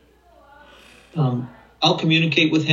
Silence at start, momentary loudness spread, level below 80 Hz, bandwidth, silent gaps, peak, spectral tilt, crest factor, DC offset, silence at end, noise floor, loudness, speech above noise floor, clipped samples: 1.15 s; 14 LU; -58 dBFS; 7.6 kHz; none; -2 dBFS; -5.5 dB/octave; 20 dB; under 0.1%; 0 s; -52 dBFS; -19 LUFS; 34 dB; under 0.1%